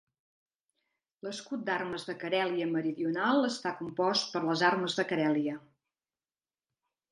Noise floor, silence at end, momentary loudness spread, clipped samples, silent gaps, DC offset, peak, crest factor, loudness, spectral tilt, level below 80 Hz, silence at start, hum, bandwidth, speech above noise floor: under -90 dBFS; 1.5 s; 10 LU; under 0.1%; none; under 0.1%; -12 dBFS; 22 dB; -31 LUFS; -4.5 dB/octave; -78 dBFS; 1.25 s; none; 11 kHz; over 59 dB